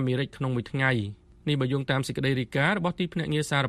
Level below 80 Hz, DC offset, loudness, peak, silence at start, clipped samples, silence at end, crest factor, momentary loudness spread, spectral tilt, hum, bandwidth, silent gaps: -56 dBFS; under 0.1%; -27 LUFS; -10 dBFS; 0 s; under 0.1%; 0 s; 18 dB; 5 LU; -6 dB/octave; none; 13 kHz; none